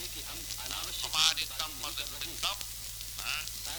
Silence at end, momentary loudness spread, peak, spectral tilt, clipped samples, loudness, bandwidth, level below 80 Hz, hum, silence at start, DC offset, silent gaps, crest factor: 0 s; 12 LU; -8 dBFS; 0.5 dB/octave; under 0.1%; -32 LUFS; over 20 kHz; -52 dBFS; none; 0 s; under 0.1%; none; 28 dB